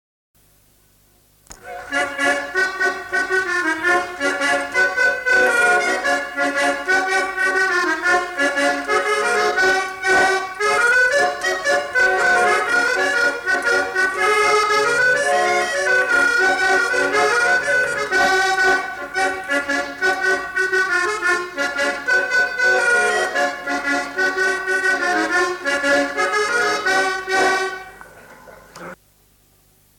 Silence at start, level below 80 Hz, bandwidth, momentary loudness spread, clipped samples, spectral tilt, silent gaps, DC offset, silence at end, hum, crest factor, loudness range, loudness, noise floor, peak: 1.5 s; -54 dBFS; 18 kHz; 6 LU; under 0.1%; -1.5 dB/octave; none; under 0.1%; 1.05 s; none; 14 dB; 4 LU; -17 LUFS; -56 dBFS; -6 dBFS